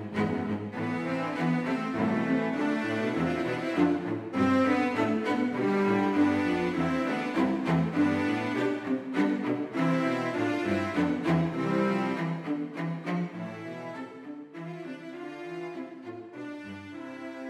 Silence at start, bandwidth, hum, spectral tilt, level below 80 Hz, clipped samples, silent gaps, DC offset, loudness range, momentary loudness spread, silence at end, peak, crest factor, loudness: 0 s; 11.5 kHz; none; -7 dB/octave; -64 dBFS; under 0.1%; none; under 0.1%; 11 LU; 15 LU; 0 s; -12 dBFS; 16 dB; -29 LUFS